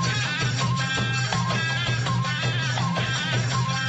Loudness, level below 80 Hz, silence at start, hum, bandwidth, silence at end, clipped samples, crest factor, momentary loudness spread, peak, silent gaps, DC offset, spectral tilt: -24 LUFS; -48 dBFS; 0 s; none; 8.4 kHz; 0 s; under 0.1%; 14 dB; 1 LU; -10 dBFS; none; under 0.1%; -4 dB/octave